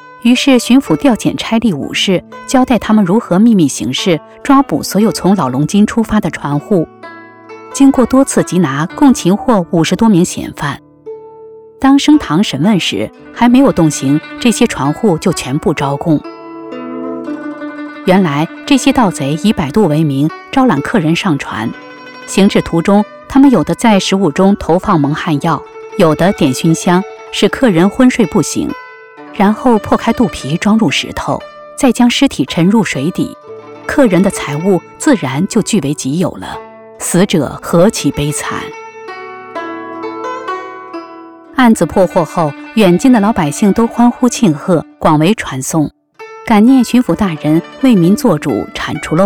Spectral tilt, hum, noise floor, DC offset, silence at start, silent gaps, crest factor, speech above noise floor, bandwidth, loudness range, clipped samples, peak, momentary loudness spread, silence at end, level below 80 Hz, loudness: -5.5 dB/octave; none; -34 dBFS; 0.4%; 0.05 s; none; 12 dB; 24 dB; 18 kHz; 4 LU; under 0.1%; 0 dBFS; 14 LU; 0 s; -40 dBFS; -12 LUFS